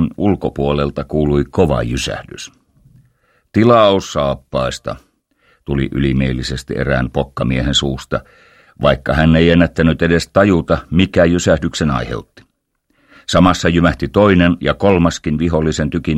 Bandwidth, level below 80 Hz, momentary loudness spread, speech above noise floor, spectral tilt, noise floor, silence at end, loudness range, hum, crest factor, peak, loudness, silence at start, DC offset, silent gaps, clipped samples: 12 kHz; -30 dBFS; 11 LU; 51 dB; -6 dB/octave; -65 dBFS; 0 s; 5 LU; none; 16 dB; 0 dBFS; -15 LUFS; 0 s; under 0.1%; none; under 0.1%